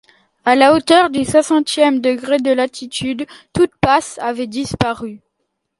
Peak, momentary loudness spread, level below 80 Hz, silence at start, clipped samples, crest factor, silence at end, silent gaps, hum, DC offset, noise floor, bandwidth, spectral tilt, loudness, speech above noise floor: 0 dBFS; 12 LU; -46 dBFS; 0.45 s; under 0.1%; 16 dB; 0.6 s; none; none; under 0.1%; -72 dBFS; 11.5 kHz; -4.5 dB/octave; -15 LUFS; 57 dB